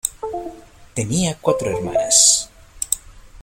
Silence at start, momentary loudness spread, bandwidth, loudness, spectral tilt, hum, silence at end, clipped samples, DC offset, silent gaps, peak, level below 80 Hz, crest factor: 0.05 s; 19 LU; 16.5 kHz; -17 LUFS; -2.5 dB/octave; none; 0 s; under 0.1%; under 0.1%; none; 0 dBFS; -46 dBFS; 20 dB